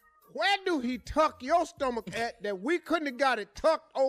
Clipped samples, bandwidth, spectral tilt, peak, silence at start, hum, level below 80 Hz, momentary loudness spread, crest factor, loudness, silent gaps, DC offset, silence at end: under 0.1%; 14.5 kHz; -4 dB/octave; -14 dBFS; 0.35 s; none; -54 dBFS; 6 LU; 14 dB; -29 LUFS; none; under 0.1%; 0 s